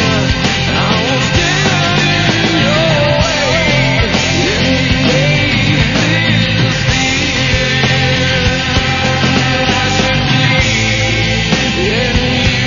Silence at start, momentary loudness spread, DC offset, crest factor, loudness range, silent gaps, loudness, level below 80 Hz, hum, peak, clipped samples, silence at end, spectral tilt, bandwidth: 0 s; 2 LU; under 0.1%; 12 dB; 1 LU; none; -11 LUFS; -26 dBFS; none; 0 dBFS; under 0.1%; 0 s; -4.5 dB/octave; 7.4 kHz